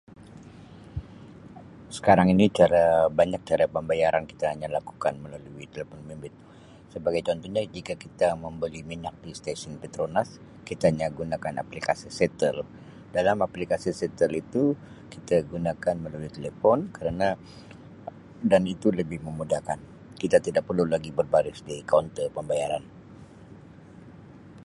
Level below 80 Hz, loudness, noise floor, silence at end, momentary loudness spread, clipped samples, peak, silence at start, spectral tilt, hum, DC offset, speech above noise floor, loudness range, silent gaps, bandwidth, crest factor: -52 dBFS; -26 LUFS; -48 dBFS; 0 s; 20 LU; under 0.1%; -4 dBFS; 0.2 s; -6.5 dB/octave; none; under 0.1%; 22 dB; 8 LU; none; 11.5 kHz; 22 dB